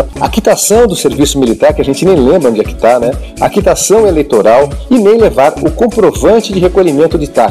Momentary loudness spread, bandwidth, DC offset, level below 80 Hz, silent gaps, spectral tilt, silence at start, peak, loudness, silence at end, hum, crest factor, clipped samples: 4 LU; 16 kHz; under 0.1%; -24 dBFS; none; -5 dB/octave; 0 s; 0 dBFS; -9 LUFS; 0 s; none; 8 dB; under 0.1%